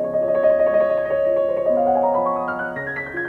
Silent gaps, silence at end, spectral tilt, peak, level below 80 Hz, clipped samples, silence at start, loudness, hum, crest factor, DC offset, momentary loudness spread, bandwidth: none; 0 s; -8 dB/octave; -6 dBFS; -54 dBFS; under 0.1%; 0 s; -19 LUFS; none; 14 dB; under 0.1%; 9 LU; 4.3 kHz